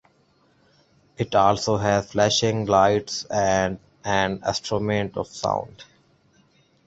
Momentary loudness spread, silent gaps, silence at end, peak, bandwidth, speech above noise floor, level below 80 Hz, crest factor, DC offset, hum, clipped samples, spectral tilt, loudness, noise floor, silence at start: 9 LU; none; 1.05 s; -4 dBFS; 8.2 kHz; 40 dB; -50 dBFS; 20 dB; under 0.1%; none; under 0.1%; -4.5 dB/octave; -22 LUFS; -62 dBFS; 1.2 s